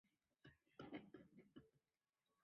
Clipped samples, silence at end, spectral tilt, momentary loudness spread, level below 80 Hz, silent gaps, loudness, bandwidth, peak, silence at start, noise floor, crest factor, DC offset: under 0.1%; 0.65 s; -5 dB/octave; 11 LU; -88 dBFS; none; -62 LUFS; 5.4 kHz; -42 dBFS; 0.05 s; under -90 dBFS; 24 dB; under 0.1%